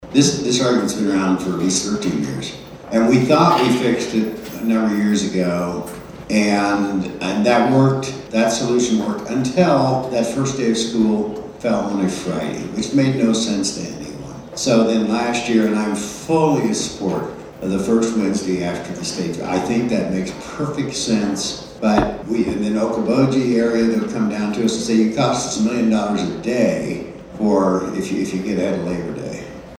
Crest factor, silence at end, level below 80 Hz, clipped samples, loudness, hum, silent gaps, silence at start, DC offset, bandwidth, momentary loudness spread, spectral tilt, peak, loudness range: 18 dB; 0.05 s; -46 dBFS; under 0.1%; -19 LUFS; none; none; 0 s; under 0.1%; 18.5 kHz; 10 LU; -5 dB/octave; 0 dBFS; 3 LU